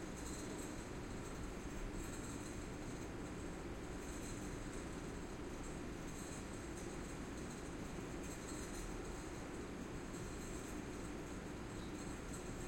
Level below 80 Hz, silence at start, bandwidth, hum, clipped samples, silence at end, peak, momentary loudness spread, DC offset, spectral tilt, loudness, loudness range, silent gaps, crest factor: -54 dBFS; 0 s; 16.5 kHz; none; under 0.1%; 0 s; -34 dBFS; 1 LU; under 0.1%; -5 dB/octave; -48 LUFS; 0 LU; none; 12 dB